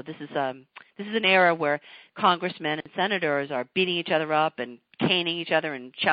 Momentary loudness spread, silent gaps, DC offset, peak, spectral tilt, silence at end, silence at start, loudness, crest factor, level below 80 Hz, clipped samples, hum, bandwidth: 13 LU; none; under 0.1%; -6 dBFS; -9 dB/octave; 0 s; 0.05 s; -25 LUFS; 20 dB; -72 dBFS; under 0.1%; none; 5.2 kHz